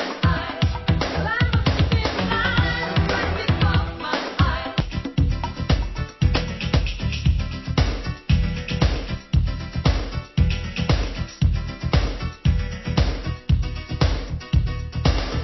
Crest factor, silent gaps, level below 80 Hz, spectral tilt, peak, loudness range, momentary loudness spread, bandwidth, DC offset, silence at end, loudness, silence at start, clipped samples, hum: 18 dB; none; -26 dBFS; -6.5 dB/octave; -4 dBFS; 3 LU; 6 LU; 6.2 kHz; under 0.1%; 0 s; -23 LUFS; 0 s; under 0.1%; none